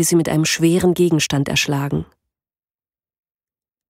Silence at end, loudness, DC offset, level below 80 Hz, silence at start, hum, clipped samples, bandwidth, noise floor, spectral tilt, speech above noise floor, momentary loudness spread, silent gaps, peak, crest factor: 1.85 s; -17 LUFS; under 0.1%; -48 dBFS; 0 s; none; under 0.1%; 16 kHz; under -90 dBFS; -4.5 dB/octave; over 73 dB; 6 LU; none; -4 dBFS; 16 dB